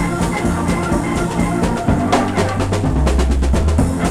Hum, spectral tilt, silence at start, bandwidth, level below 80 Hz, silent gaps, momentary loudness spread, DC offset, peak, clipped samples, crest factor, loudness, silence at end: none; -6 dB/octave; 0 s; 14 kHz; -22 dBFS; none; 3 LU; under 0.1%; 0 dBFS; under 0.1%; 16 dB; -17 LUFS; 0 s